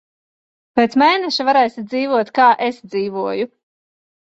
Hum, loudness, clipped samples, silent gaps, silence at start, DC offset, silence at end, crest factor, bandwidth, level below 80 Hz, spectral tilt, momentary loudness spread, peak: none; -17 LUFS; under 0.1%; none; 0.75 s; under 0.1%; 0.75 s; 16 dB; 8 kHz; -64 dBFS; -4.5 dB/octave; 9 LU; -2 dBFS